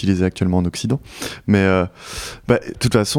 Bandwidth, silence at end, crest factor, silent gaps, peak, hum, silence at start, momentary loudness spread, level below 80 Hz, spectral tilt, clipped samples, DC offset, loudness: 16.5 kHz; 0 s; 18 dB; none; -2 dBFS; none; 0 s; 13 LU; -44 dBFS; -5.5 dB/octave; under 0.1%; under 0.1%; -20 LUFS